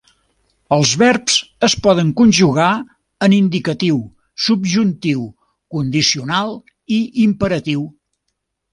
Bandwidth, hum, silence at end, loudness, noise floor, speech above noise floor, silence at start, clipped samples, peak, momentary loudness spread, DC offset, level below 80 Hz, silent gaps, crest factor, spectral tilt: 11 kHz; none; 0.8 s; -15 LUFS; -73 dBFS; 58 dB; 0.7 s; under 0.1%; 0 dBFS; 11 LU; under 0.1%; -48 dBFS; none; 16 dB; -4.5 dB/octave